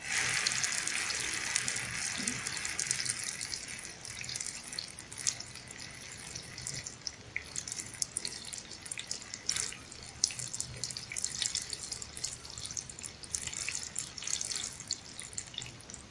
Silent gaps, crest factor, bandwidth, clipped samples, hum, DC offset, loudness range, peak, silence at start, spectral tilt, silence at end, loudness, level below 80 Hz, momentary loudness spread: none; 30 dB; 12 kHz; under 0.1%; none; under 0.1%; 6 LU; -8 dBFS; 0 s; 0 dB/octave; 0 s; -36 LUFS; -62 dBFS; 11 LU